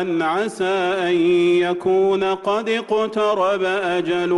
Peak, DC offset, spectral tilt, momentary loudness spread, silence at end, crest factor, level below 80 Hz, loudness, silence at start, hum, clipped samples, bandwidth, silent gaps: -10 dBFS; under 0.1%; -5.5 dB/octave; 5 LU; 0 s; 10 dB; -60 dBFS; -19 LUFS; 0 s; none; under 0.1%; 11.5 kHz; none